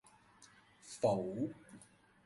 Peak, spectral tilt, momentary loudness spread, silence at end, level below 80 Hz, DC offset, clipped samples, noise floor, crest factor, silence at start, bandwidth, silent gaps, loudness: -20 dBFS; -6.5 dB/octave; 24 LU; 0.4 s; -74 dBFS; under 0.1%; under 0.1%; -64 dBFS; 20 dB; 0.4 s; 11.5 kHz; none; -38 LUFS